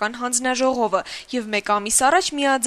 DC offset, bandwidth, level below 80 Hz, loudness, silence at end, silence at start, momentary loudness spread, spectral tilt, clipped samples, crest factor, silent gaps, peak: under 0.1%; 13.5 kHz; -56 dBFS; -20 LUFS; 0 s; 0 s; 9 LU; -1.5 dB/octave; under 0.1%; 16 dB; none; -4 dBFS